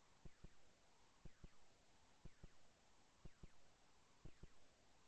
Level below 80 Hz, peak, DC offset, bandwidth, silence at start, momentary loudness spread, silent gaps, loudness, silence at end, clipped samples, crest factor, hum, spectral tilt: -70 dBFS; -48 dBFS; under 0.1%; 8.4 kHz; 0 s; 2 LU; none; -69 LUFS; 0 s; under 0.1%; 16 dB; none; -4.5 dB/octave